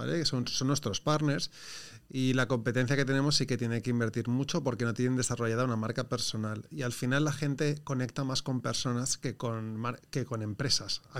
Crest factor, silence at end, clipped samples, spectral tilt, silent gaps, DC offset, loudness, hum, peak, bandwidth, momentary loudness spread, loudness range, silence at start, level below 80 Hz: 18 dB; 0 s; under 0.1%; -4.5 dB/octave; none; 0.3%; -31 LUFS; none; -12 dBFS; 16 kHz; 8 LU; 3 LU; 0 s; -60 dBFS